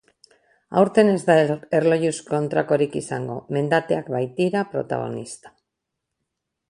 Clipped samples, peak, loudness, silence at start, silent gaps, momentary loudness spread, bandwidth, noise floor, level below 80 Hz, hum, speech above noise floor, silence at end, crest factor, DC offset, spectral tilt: under 0.1%; -2 dBFS; -21 LUFS; 0.7 s; none; 12 LU; 11.5 kHz; -81 dBFS; -64 dBFS; none; 60 dB; 1.2 s; 20 dB; under 0.1%; -6 dB/octave